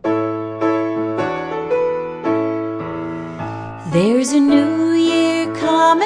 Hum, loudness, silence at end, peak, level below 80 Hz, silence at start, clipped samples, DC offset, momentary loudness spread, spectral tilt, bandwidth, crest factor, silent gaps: none; -18 LUFS; 0 s; -2 dBFS; -54 dBFS; 0.05 s; under 0.1%; under 0.1%; 12 LU; -5.5 dB/octave; 10.5 kHz; 16 dB; none